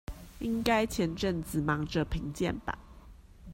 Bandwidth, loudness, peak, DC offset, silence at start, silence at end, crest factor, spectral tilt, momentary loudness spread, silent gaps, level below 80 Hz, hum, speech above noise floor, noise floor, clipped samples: 16 kHz; -32 LUFS; -12 dBFS; under 0.1%; 0.1 s; 0 s; 22 dB; -5.5 dB/octave; 11 LU; none; -46 dBFS; none; 21 dB; -52 dBFS; under 0.1%